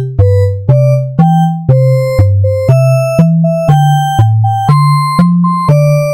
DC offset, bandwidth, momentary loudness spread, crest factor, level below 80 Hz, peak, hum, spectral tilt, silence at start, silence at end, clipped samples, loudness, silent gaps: under 0.1%; 16 kHz; 2 LU; 8 dB; -34 dBFS; 0 dBFS; none; -8 dB/octave; 0 s; 0 s; 0.3%; -9 LUFS; none